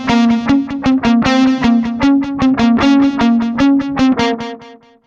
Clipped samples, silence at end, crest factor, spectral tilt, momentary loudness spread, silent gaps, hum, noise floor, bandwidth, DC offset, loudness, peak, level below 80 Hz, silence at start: under 0.1%; 0.35 s; 12 dB; -5.5 dB/octave; 4 LU; none; none; -39 dBFS; 7.4 kHz; under 0.1%; -13 LUFS; -2 dBFS; -38 dBFS; 0 s